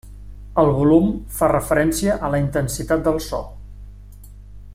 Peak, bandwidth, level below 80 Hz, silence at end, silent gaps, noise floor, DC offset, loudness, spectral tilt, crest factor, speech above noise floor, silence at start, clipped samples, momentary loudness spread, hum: -4 dBFS; 16 kHz; -36 dBFS; 0 s; none; -39 dBFS; under 0.1%; -19 LUFS; -6 dB/octave; 18 dB; 21 dB; 0.05 s; under 0.1%; 9 LU; 50 Hz at -35 dBFS